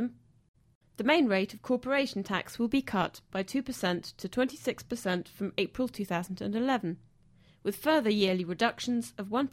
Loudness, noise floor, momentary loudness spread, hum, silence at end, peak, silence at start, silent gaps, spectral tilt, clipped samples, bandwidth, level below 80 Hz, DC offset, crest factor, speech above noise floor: -31 LUFS; -61 dBFS; 9 LU; none; 0.05 s; -12 dBFS; 0 s; 0.48-0.54 s, 0.75-0.81 s; -5 dB/octave; under 0.1%; 16.5 kHz; -62 dBFS; under 0.1%; 20 dB; 31 dB